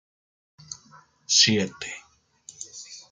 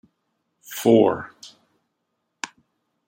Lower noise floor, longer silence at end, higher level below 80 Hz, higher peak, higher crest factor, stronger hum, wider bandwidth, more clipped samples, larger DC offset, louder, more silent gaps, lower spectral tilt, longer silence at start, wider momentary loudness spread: second, -55 dBFS vs -76 dBFS; second, 0.1 s vs 0.6 s; about the same, -70 dBFS vs -68 dBFS; second, -6 dBFS vs -2 dBFS; about the same, 24 dB vs 22 dB; neither; second, 12 kHz vs 16.5 kHz; neither; neither; about the same, -20 LUFS vs -19 LUFS; neither; second, -2 dB/octave vs -5.5 dB/octave; about the same, 0.7 s vs 0.7 s; first, 24 LU vs 19 LU